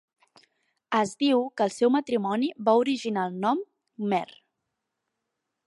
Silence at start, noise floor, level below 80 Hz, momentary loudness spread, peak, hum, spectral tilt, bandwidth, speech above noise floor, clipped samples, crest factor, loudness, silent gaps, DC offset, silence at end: 0.9 s; -83 dBFS; -78 dBFS; 7 LU; -8 dBFS; none; -5.5 dB/octave; 11.5 kHz; 58 dB; under 0.1%; 18 dB; -26 LUFS; none; under 0.1%; 1.4 s